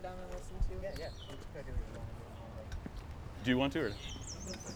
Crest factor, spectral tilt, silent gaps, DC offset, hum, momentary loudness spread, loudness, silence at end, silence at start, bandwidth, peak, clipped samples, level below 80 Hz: 22 dB; -5 dB/octave; none; under 0.1%; none; 15 LU; -41 LUFS; 0 s; 0 s; over 20 kHz; -18 dBFS; under 0.1%; -46 dBFS